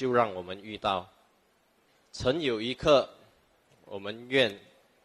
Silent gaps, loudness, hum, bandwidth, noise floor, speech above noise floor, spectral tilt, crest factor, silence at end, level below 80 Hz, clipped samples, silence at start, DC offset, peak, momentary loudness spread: none; -29 LUFS; none; 13 kHz; -68 dBFS; 39 dB; -5 dB/octave; 22 dB; 0.45 s; -58 dBFS; under 0.1%; 0 s; under 0.1%; -10 dBFS; 16 LU